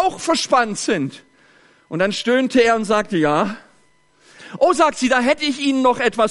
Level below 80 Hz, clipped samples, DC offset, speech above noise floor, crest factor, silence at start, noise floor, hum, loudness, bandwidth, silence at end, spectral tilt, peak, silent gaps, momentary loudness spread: -54 dBFS; under 0.1%; under 0.1%; 40 dB; 16 dB; 0 s; -58 dBFS; none; -18 LUFS; 11.5 kHz; 0 s; -4 dB/octave; -4 dBFS; none; 8 LU